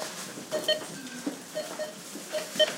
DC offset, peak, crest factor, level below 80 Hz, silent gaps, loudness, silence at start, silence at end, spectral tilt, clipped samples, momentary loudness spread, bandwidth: under 0.1%; -12 dBFS; 22 dB; -80 dBFS; none; -33 LUFS; 0 s; 0 s; -2 dB/octave; under 0.1%; 10 LU; 16.5 kHz